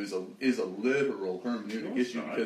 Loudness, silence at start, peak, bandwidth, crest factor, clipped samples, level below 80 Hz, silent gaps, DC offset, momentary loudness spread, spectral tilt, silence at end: -32 LUFS; 0 s; -16 dBFS; 12.5 kHz; 16 dB; under 0.1%; -84 dBFS; none; under 0.1%; 6 LU; -5 dB/octave; 0 s